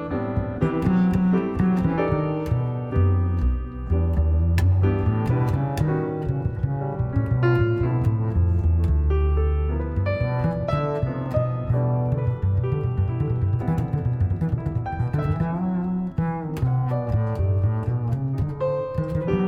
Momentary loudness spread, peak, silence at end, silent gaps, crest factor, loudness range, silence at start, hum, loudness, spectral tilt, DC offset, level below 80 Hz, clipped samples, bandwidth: 5 LU; -8 dBFS; 0 s; none; 14 dB; 2 LU; 0 s; none; -23 LUFS; -10 dB/octave; under 0.1%; -30 dBFS; under 0.1%; 6 kHz